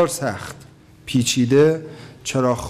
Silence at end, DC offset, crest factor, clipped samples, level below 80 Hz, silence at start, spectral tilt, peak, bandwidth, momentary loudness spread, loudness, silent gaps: 0 s; under 0.1%; 14 dB; under 0.1%; -52 dBFS; 0 s; -5 dB/octave; -6 dBFS; 16 kHz; 20 LU; -19 LUFS; none